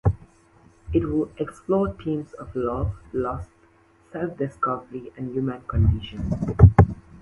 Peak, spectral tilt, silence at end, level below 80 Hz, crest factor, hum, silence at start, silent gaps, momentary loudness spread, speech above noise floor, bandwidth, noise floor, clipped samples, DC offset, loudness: 0 dBFS; -10 dB/octave; 0.05 s; -32 dBFS; 22 dB; none; 0.05 s; none; 17 LU; 32 dB; 6.6 kHz; -57 dBFS; under 0.1%; under 0.1%; -24 LUFS